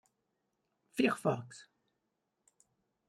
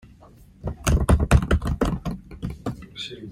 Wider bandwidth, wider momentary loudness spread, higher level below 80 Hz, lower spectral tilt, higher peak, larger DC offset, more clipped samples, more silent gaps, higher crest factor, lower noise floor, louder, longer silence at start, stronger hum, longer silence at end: about the same, 15 kHz vs 16 kHz; first, 21 LU vs 15 LU; second, -82 dBFS vs -28 dBFS; about the same, -5.5 dB/octave vs -6 dB/octave; second, -16 dBFS vs -4 dBFS; neither; neither; neither; about the same, 24 dB vs 20 dB; first, -84 dBFS vs -49 dBFS; second, -34 LUFS vs -24 LUFS; first, 0.95 s vs 0.65 s; neither; first, 1.45 s vs 0 s